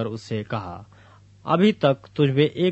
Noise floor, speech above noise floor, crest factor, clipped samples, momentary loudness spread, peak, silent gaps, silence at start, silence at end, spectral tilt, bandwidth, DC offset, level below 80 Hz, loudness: -51 dBFS; 29 dB; 18 dB; under 0.1%; 19 LU; -4 dBFS; none; 0 s; 0 s; -7.5 dB/octave; 8.2 kHz; under 0.1%; -60 dBFS; -22 LUFS